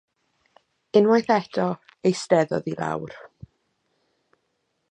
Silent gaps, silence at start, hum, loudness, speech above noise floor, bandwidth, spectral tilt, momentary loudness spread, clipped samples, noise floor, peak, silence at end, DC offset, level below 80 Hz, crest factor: none; 0.95 s; none; -23 LUFS; 52 dB; 9.4 kHz; -6 dB/octave; 12 LU; under 0.1%; -74 dBFS; -4 dBFS; 1.65 s; under 0.1%; -66 dBFS; 20 dB